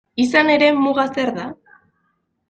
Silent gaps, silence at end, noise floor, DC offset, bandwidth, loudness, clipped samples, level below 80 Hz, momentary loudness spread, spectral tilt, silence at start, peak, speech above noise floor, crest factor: none; 0.95 s; -69 dBFS; under 0.1%; 9 kHz; -16 LUFS; under 0.1%; -62 dBFS; 13 LU; -4.5 dB/octave; 0.15 s; -2 dBFS; 52 dB; 18 dB